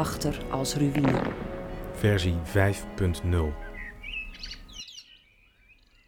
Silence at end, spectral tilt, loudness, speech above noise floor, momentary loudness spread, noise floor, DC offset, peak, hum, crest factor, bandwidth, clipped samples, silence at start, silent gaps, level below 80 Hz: 1.05 s; -5.5 dB/octave; -28 LUFS; 34 dB; 15 LU; -60 dBFS; under 0.1%; -8 dBFS; none; 20 dB; 17.5 kHz; under 0.1%; 0 s; none; -40 dBFS